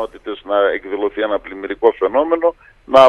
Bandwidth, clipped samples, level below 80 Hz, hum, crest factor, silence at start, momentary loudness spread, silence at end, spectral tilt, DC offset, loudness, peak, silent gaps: 10 kHz; under 0.1%; -50 dBFS; none; 16 dB; 0 s; 10 LU; 0 s; -5 dB/octave; under 0.1%; -18 LUFS; 0 dBFS; none